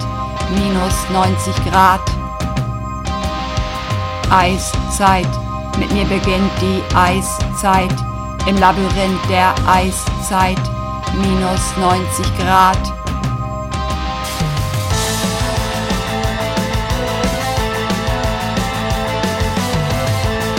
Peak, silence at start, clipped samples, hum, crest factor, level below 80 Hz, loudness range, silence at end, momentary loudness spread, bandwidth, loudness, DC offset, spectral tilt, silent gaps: 0 dBFS; 0 s; under 0.1%; none; 16 dB; -26 dBFS; 3 LU; 0 s; 8 LU; 17 kHz; -16 LUFS; under 0.1%; -5 dB/octave; none